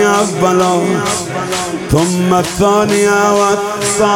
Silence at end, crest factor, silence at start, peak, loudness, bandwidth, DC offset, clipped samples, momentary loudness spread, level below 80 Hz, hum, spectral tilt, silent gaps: 0 s; 12 dB; 0 s; 0 dBFS; -13 LUFS; 17.5 kHz; under 0.1%; under 0.1%; 7 LU; -38 dBFS; none; -4.5 dB/octave; none